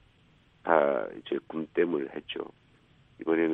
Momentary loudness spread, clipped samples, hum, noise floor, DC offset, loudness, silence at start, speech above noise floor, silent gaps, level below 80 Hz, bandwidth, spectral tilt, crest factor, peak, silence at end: 14 LU; under 0.1%; none; -62 dBFS; under 0.1%; -30 LUFS; 0.65 s; 32 dB; none; -70 dBFS; 4 kHz; -8 dB/octave; 24 dB; -6 dBFS; 0 s